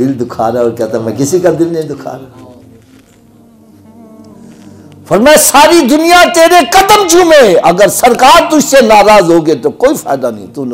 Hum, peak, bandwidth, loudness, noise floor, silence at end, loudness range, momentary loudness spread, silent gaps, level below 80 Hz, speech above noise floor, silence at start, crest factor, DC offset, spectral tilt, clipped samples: none; 0 dBFS; 16.5 kHz; -6 LUFS; -41 dBFS; 0 s; 12 LU; 11 LU; none; -38 dBFS; 34 dB; 0 s; 8 dB; under 0.1%; -3.5 dB/octave; 0.8%